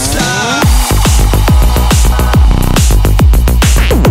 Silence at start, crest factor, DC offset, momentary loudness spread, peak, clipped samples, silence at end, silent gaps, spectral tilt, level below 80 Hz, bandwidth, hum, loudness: 0 s; 8 dB; under 0.1%; 1 LU; 0 dBFS; under 0.1%; 0 s; none; -4.5 dB/octave; -8 dBFS; 16.5 kHz; none; -9 LUFS